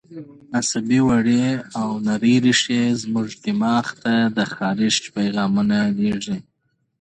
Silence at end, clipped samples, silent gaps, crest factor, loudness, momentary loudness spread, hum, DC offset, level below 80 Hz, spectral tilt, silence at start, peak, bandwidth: 0.6 s; under 0.1%; none; 16 dB; -20 LUFS; 9 LU; none; under 0.1%; -56 dBFS; -4.5 dB/octave; 0.1 s; -4 dBFS; 9.4 kHz